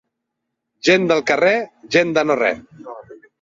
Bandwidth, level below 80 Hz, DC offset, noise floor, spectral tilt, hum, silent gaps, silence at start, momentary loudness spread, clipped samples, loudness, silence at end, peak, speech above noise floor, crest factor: 7.8 kHz; -60 dBFS; under 0.1%; -78 dBFS; -4.5 dB/octave; none; none; 0.85 s; 21 LU; under 0.1%; -17 LUFS; 0.25 s; -2 dBFS; 61 dB; 18 dB